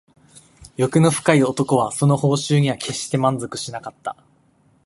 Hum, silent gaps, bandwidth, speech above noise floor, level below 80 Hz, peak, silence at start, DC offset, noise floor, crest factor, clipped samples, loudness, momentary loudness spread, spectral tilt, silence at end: none; none; 11.5 kHz; 39 dB; -56 dBFS; 0 dBFS; 0.8 s; under 0.1%; -58 dBFS; 20 dB; under 0.1%; -19 LUFS; 14 LU; -5.5 dB/octave; 0.75 s